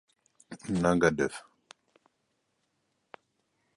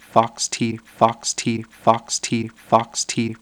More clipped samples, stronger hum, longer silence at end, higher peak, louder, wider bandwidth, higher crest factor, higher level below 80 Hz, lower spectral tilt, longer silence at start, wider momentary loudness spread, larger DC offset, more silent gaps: neither; neither; first, 2.35 s vs 0.05 s; second, -8 dBFS vs 0 dBFS; second, -28 LUFS vs -21 LUFS; second, 11.5 kHz vs over 20 kHz; about the same, 24 dB vs 22 dB; about the same, -58 dBFS vs -60 dBFS; first, -6 dB/octave vs -3.5 dB/octave; first, 0.5 s vs 0.15 s; first, 21 LU vs 6 LU; neither; neither